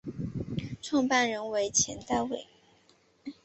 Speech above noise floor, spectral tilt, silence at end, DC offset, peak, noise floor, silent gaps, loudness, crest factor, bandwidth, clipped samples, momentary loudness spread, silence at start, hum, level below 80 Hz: 36 dB; -3 dB/octave; 0.1 s; under 0.1%; -12 dBFS; -65 dBFS; none; -30 LUFS; 20 dB; 8.6 kHz; under 0.1%; 12 LU; 0.05 s; none; -56 dBFS